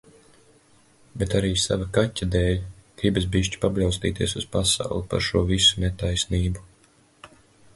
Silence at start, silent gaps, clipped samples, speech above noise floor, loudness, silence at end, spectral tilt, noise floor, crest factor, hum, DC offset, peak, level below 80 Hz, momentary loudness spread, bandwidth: 1.15 s; none; under 0.1%; 35 dB; -23 LUFS; 0.5 s; -4.5 dB/octave; -58 dBFS; 18 dB; none; under 0.1%; -6 dBFS; -36 dBFS; 9 LU; 11.5 kHz